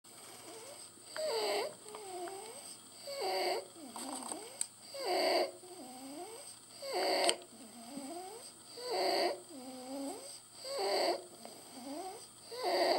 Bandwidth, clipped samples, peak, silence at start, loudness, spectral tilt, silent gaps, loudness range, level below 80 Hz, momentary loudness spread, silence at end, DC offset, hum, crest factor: 16.5 kHz; under 0.1%; -10 dBFS; 0.05 s; -38 LUFS; -1 dB/octave; none; 4 LU; -88 dBFS; 17 LU; 0 s; under 0.1%; none; 28 dB